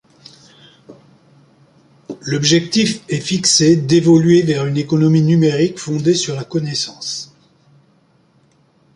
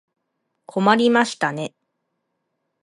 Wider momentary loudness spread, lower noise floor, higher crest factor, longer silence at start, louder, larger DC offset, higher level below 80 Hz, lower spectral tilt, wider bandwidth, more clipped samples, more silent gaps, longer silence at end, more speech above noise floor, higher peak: about the same, 13 LU vs 15 LU; second, -55 dBFS vs -75 dBFS; second, 16 dB vs 22 dB; first, 0.9 s vs 0.75 s; first, -15 LUFS vs -19 LUFS; neither; first, -56 dBFS vs -72 dBFS; about the same, -5 dB/octave vs -5 dB/octave; about the same, 11.5 kHz vs 11.5 kHz; neither; neither; first, 1.7 s vs 1.15 s; second, 41 dB vs 57 dB; about the same, 0 dBFS vs -2 dBFS